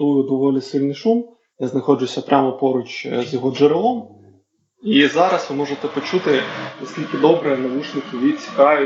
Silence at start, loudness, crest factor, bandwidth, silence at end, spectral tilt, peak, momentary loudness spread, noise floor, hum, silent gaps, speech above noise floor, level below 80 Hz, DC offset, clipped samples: 0 s; -19 LUFS; 18 dB; 7.8 kHz; 0 s; -6 dB/octave; 0 dBFS; 11 LU; -58 dBFS; none; none; 40 dB; -74 dBFS; under 0.1%; under 0.1%